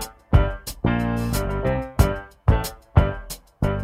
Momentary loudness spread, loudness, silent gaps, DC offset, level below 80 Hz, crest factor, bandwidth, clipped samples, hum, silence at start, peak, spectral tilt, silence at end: 6 LU; -23 LUFS; none; under 0.1%; -26 dBFS; 20 dB; 16 kHz; under 0.1%; none; 0 s; -2 dBFS; -6.5 dB/octave; 0 s